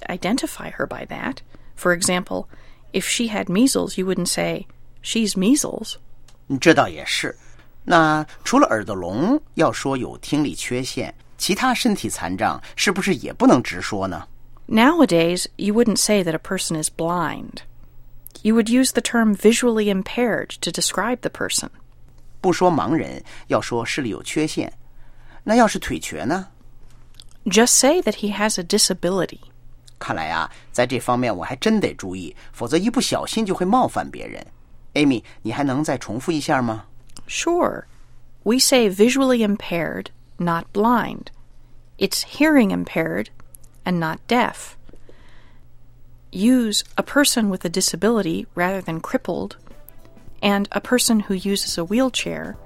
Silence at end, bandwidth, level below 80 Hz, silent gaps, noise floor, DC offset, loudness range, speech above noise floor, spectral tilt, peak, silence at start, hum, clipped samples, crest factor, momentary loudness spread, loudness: 0 s; 16.5 kHz; -44 dBFS; none; -42 dBFS; under 0.1%; 4 LU; 22 dB; -4 dB/octave; 0 dBFS; 0 s; none; under 0.1%; 20 dB; 13 LU; -20 LUFS